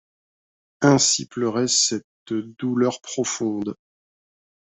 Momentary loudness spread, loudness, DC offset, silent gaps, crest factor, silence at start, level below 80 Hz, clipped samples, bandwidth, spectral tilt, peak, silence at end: 13 LU; -21 LUFS; under 0.1%; 2.04-2.26 s; 20 dB; 0.8 s; -64 dBFS; under 0.1%; 8.4 kHz; -3.5 dB/octave; -4 dBFS; 0.9 s